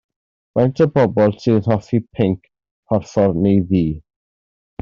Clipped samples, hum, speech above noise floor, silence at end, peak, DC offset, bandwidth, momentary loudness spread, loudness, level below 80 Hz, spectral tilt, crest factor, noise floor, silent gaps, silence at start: under 0.1%; none; over 74 dB; 0.8 s; -2 dBFS; under 0.1%; 7.2 kHz; 8 LU; -17 LUFS; -46 dBFS; -8.5 dB/octave; 16 dB; under -90 dBFS; 2.71-2.83 s; 0.55 s